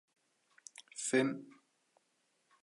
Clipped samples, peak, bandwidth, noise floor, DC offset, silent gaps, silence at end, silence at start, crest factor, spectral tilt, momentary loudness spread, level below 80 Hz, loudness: under 0.1%; -20 dBFS; 11.5 kHz; -78 dBFS; under 0.1%; none; 1.1 s; 0.95 s; 22 dB; -3.5 dB/octave; 22 LU; under -90 dBFS; -35 LUFS